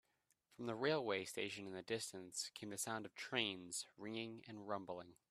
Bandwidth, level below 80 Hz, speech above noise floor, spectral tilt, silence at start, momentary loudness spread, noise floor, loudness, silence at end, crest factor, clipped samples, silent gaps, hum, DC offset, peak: 15 kHz; -86 dBFS; 35 dB; -3 dB/octave; 0.5 s; 10 LU; -81 dBFS; -45 LUFS; 0.15 s; 26 dB; under 0.1%; none; none; under 0.1%; -22 dBFS